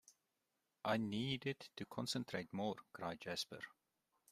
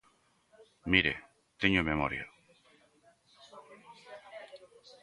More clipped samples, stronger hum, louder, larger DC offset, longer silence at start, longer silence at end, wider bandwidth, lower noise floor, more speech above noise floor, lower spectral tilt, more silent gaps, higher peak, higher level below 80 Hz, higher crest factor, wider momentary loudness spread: neither; neither; second, -44 LUFS vs -30 LUFS; neither; second, 0.1 s vs 0.85 s; first, 0.6 s vs 0.45 s; first, 15 kHz vs 11.5 kHz; first, -88 dBFS vs -69 dBFS; first, 44 dB vs 39 dB; second, -4.5 dB/octave vs -6 dB/octave; neither; second, -24 dBFS vs -8 dBFS; second, -78 dBFS vs -54 dBFS; second, 20 dB vs 28 dB; second, 9 LU vs 27 LU